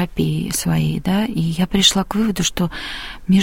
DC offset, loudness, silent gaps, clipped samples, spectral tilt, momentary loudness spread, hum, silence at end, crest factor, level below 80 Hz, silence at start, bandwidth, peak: under 0.1%; -19 LUFS; none; under 0.1%; -4.5 dB/octave; 9 LU; none; 0 s; 18 dB; -36 dBFS; 0 s; 17 kHz; 0 dBFS